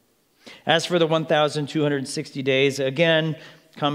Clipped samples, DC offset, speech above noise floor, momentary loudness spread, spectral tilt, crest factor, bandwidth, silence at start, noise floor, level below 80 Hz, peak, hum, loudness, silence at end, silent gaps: under 0.1%; under 0.1%; 30 dB; 10 LU; -5 dB/octave; 22 dB; 15 kHz; 0.45 s; -51 dBFS; -74 dBFS; -2 dBFS; none; -22 LUFS; 0 s; none